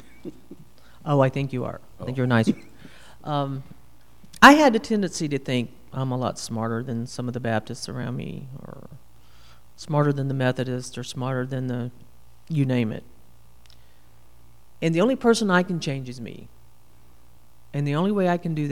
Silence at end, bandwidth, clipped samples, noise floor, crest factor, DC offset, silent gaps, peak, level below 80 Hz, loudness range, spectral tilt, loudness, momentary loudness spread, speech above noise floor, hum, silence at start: 0 s; 16 kHz; under 0.1%; -56 dBFS; 24 dB; 0.7%; none; 0 dBFS; -56 dBFS; 10 LU; -5.5 dB/octave; -23 LUFS; 18 LU; 33 dB; none; 0.25 s